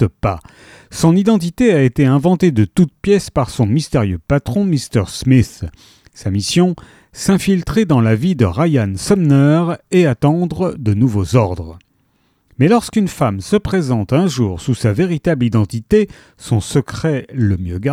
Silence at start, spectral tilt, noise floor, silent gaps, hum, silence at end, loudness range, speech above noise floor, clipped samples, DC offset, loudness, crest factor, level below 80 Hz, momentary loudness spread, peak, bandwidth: 0 s; -7 dB/octave; -60 dBFS; none; none; 0 s; 3 LU; 45 dB; under 0.1%; under 0.1%; -15 LUFS; 14 dB; -38 dBFS; 7 LU; 0 dBFS; 15 kHz